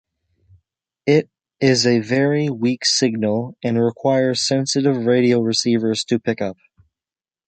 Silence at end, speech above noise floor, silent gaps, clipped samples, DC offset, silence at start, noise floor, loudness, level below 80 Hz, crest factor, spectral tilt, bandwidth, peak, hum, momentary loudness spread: 0.95 s; over 72 dB; none; under 0.1%; under 0.1%; 1.05 s; under -90 dBFS; -18 LUFS; -60 dBFS; 18 dB; -4.5 dB/octave; 9.2 kHz; -2 dBFS; none; 7 LU